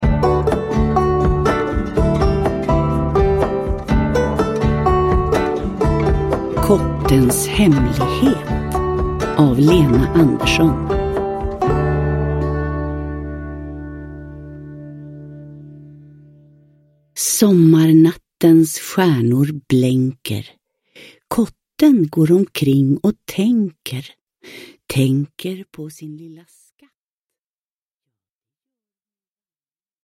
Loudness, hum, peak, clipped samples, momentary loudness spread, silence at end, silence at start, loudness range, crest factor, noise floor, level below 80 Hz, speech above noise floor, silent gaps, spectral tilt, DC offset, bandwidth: -16 LUFS; none; 0 dBFS; under 0.1%; 19 LU; 3.7 s; 0 s; 12 LU; 16 dB; under -90 dBFS; -28 dBFS; over 75 dB; 24.21-24.27 s; -6.5 dB/octave; under 0.1%; 16.5 kHz